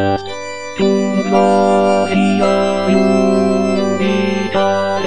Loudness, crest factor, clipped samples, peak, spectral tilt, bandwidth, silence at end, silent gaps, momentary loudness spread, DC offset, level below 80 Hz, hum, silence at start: -14 LUFS; 14 dB; under 0.1%; 0 dBFS; -6 dB/octave; 10 kHz; 0 s; none; 6 LU; 2%; -50 dBFS; none; 0 s